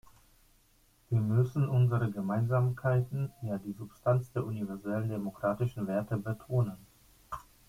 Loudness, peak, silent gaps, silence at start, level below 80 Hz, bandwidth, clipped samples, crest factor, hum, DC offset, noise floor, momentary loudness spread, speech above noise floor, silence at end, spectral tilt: -32 LUFS; -14 dBFS; none; 1.1 s; -60 dBFS; 15.5 kHz; under 0.1%; 18 dB; none; under 0.1%; -66 dBFS; 10 LU; 35 dB; 0.3 s; -9.5 dB/octave